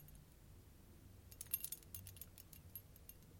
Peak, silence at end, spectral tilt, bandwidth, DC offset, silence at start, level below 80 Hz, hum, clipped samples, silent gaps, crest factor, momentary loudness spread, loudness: -24 dBFS; 0 s; -2.5 dB/octave; 17 kHz; under 0.1%; 0 s; -66 dBFS; none; under 0.1%; none; 30 dB; 20 LU; -50 LUFS